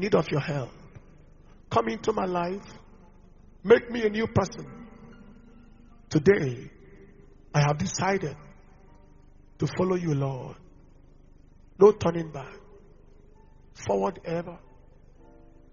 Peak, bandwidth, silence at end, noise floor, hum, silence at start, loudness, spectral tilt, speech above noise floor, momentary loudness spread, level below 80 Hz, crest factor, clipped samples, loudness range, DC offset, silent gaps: -4 dBFS; 7.2 kHz; 1.15 s; -52 dBFS; 50 Hz at -50 dBFS; 0 s; -26 LUFS; -6 dB/octave; 27 dB; 21 LU; -52 dBFS; 24 dB; under 0.1%; 6 LU; under 0.1%; none